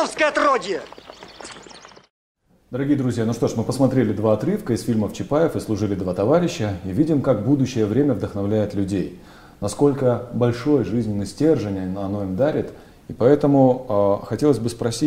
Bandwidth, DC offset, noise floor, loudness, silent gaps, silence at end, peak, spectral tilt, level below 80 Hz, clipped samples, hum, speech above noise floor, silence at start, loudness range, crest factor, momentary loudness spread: 15.5 kHz; under 0.1%; -44 dBFS; -21 LUFS; 2.10-2.35 s; 0 s; -2 dBFS; -7 dB/octave; -50 dBFS; under 0.1%; none; 24 dB; 0 s; 4 LU; 18 dB; 11 LU